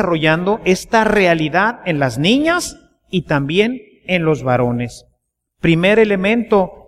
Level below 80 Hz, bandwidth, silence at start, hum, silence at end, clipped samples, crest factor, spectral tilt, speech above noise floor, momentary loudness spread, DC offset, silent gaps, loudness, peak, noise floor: -44 dBFS; 14.5 kHz; 0 s; none; 0.1 s; under 0.1%; 14 dB; -5.5 dB/octave; 53 dB; 8 LU; under 0.1%; none; -15 LUFS; -2 dBFS; -68 dBFS